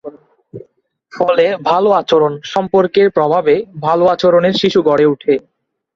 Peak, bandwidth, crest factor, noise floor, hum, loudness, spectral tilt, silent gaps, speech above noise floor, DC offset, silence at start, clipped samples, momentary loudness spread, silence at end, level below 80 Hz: -2 dBFS; 7.4 kHz; 12 dB; -54 dBFS; none; -13 LUFS; -6 dB/octave; none; 41 dB; under 0.1%; 0.05 s; under 0.1%; 6 LU; 0.55 s; -56 dBFS